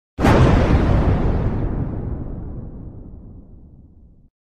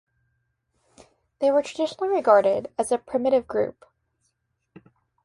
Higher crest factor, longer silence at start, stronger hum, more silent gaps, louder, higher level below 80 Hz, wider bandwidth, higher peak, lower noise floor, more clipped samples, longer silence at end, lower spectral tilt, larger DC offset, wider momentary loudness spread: about the same, 18 dB vs 22 dB; second, 0.2 s vs 1.4 s; neither; neither; first, -18 LUFS vs -23 LUFS; first, -24 dBFS vs -64 dBFS; about the same, 12.5 kHz vs 11.5 kHz; about the same, -2 dBFS vs -4 dBFS; second, -47 dBFS vs -74 dBFS; neither; second, 0.8 s vs 1.55 s; first, -8 dB/octave vs -4.5 dB/octave; neither; first, 23 LU vs 9 LU